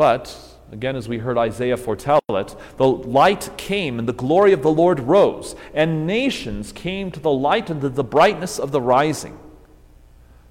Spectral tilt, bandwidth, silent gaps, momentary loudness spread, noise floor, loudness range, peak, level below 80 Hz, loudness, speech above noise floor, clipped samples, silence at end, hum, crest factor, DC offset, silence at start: -5.5 dB/octave; 16.5 kHz; none; 12 LU; -47 dBFS; 3 LU; -2 dBFS; -46 dBFS; -19 LUFS; 28 dB; under 0.1%; 1 s; none; 16 dB; under 0.1%; 0 s